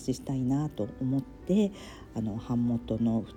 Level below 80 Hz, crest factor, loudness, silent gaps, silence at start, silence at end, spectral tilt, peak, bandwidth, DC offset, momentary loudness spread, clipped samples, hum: -52 dBFS; 14 dB; -31 LUFS; none; 0 s; 0 s; -8 dB/octave; -16 dBFS; 13 kHz; under 0.1%; 7 LU; under 0.1%; none